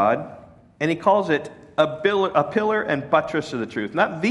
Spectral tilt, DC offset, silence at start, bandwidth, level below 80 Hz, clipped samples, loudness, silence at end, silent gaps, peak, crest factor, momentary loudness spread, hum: -6 dB/octave; under 0.1%; 0 s; 11.5 kHz; -62 dBFS; under 0.1%; -22 LUFS; 0 s; none; -4 dBFS; 18 dB; 8 LU; none